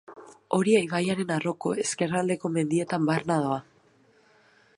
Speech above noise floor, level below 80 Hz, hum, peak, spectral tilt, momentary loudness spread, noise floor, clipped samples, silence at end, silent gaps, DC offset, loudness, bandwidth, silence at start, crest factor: 35 dB; -70 dBFS; none; -10 dBFS; -5.5 dB/octave; 6 LU; -61 dBFS; under 0.1%; 1.15 s; none; under 0.1%; -26 LUFS; 11.5 kHz; 0.1 s; 18 dB